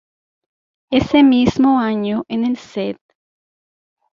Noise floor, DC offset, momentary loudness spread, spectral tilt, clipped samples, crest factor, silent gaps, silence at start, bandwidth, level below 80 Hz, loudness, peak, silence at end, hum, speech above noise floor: under -90 dBFS; under 0.1%; 13 LU; -6.5 dB/octave; under 0.1%; 16 dB; none; 0.9 s; 7.2 kHz; -46 dBFS; -16 LUFS; -2 dBFS; 1.2 s; none; over 75 dB